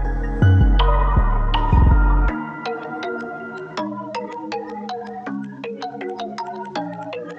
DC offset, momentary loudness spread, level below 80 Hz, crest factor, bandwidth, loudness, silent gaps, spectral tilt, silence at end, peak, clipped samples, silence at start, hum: under 0.1%; 14 LU; -22 dBFS; 16 dB; 6.6 kHz; -22 LUFS; none; -8 dB/octave; 0 s; -4 dBFS; under 0.1%; 0 s; none